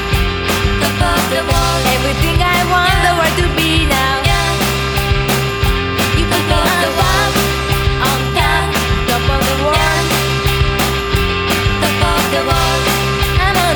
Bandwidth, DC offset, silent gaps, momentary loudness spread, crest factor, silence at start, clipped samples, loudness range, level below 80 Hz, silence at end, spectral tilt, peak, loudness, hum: over 20 kHz; under 0.1%; none; 3 LU; 14 dB; 0 s; under 0.1%; 1 LU; -22 dBFS; 0 s; -4 dB/octave; 0 dBFS; -13 LUFS; none